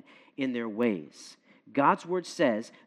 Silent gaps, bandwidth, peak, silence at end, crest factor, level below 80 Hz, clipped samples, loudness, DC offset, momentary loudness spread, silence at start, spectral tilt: none; 12 kHz; -8 dBFS; 0.2 s; 22 dB; -88 dBFS; under 0.1%; -29 LUFS; under 0.1%; 22 LU; 0.4 s; -5.5 dB/octave